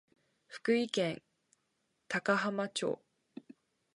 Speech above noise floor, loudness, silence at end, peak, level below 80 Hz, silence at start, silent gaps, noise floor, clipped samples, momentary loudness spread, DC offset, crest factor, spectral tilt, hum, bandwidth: 47 dB; -34 LUFS; 1 s; -14 dBFS; -82 dBFS; 0.5 s; none; -80 dBFS; under 0.1%; 22 LU; under 0.1%; 22 dB; -4.5 dB/octave; none; 11.5 kHz